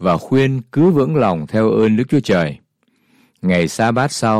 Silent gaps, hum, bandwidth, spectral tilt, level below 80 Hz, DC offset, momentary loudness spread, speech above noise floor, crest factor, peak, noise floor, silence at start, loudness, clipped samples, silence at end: none; none; 14 kHz; -6.5 dB/octave; -50 dBFS; under 0.1%; 4 LU; 46 dB; 12 dB; -4 dBFS; -61 dBFS; 0 s; -16 LUFS; under 0.1%; 0 s